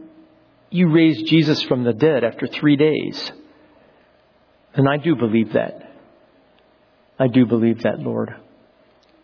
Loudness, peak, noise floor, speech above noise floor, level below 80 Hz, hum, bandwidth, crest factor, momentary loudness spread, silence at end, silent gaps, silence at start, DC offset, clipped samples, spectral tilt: -18 LUFS; -4 dBFS; -56 dBFS; 39 dB; -62 dBFS; none; 5.4 kHz; 16 dB; 11 LU; 0.85 s; none; 0 s; under 0.1%; under 0.1%; -8 dB/octave